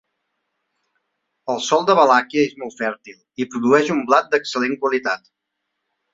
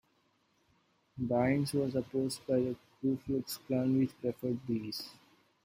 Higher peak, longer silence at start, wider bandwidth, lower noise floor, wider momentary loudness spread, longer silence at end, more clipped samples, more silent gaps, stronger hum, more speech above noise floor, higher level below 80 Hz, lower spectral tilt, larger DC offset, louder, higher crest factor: first, 0 dBFS vs -18 dBFS; first, 1.45 s vs 1.15 s; second, 7.8 kHz vs 16 kHz; first, -77 dBFS vs -73 dBFS; first, 14 LU vs 10 LU; first, 0.95 s vs 0.5 s; neither; neither; first, 50 Hz at -65 dBFS vs none; first, 59 dB vs 40 dB; about the same, -68 dBFS vs -66 dBFS; second, -4 dB/octave vs -6.5 dB/octave; neither; first, -19 LUFS vs -34 LUFS; about the same, 20 dB vs 18 dB